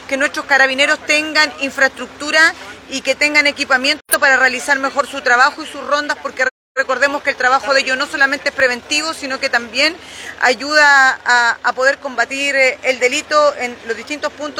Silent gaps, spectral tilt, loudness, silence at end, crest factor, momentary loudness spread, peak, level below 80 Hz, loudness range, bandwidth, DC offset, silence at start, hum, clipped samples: 6.51-6.75 s; -0.5 dB/octave; -14 LUFS; 0 s; 16 dB; 10 LU; 0 dBFS; -56 dBFS; 3 LU; 19 kHz; under 0.1%; 0 s; none; under 0.1%